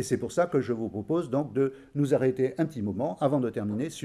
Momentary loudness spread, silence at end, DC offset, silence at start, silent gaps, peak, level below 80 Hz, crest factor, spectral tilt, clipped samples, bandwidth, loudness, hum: 6 LU; 0 s; under 0.1%; 0 s; none; -12 dBFS; -64 dBFS; 16 dB; -7 dB/octave; under 0.1%; 13.5 kHz; -28 LUFS; none